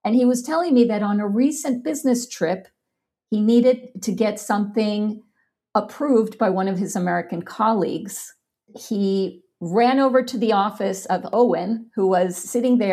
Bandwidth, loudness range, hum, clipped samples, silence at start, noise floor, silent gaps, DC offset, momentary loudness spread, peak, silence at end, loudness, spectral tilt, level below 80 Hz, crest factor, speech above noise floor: 15 kHz; 3 LU; none; under 0.1%; 0.05 s; -81 dBFS; none; under 0.1%; 10 LU; -4 dBFS; 0 s; -21 LUFS; -5.5 dB/octave; -72 dBFS; 16 dB; 61 dB